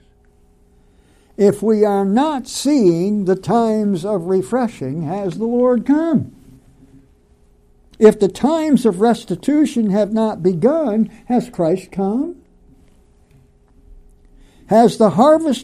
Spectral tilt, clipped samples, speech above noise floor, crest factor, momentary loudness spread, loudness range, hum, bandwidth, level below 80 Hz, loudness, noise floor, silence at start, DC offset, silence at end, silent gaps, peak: -7 dB/octave; under 0.1%; 37 dB; 18 dB; 8 LU; 5 LU; none; 14 kHz; -50 dBFS; -16 LUFS; -52 dBFS; 1.4 s; under 0.1%; 0 s; none; 0 dBFS